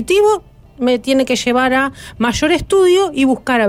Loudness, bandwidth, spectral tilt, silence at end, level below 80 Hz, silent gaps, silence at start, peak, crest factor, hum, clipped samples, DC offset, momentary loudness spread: -14 LUFS; 16 kHz; -4 dB/octave; 0 s; -40 dBFS; none; 0 s; -4 dBFS; 10 dB; none; under 0.1%; under 0.1%; 7 LU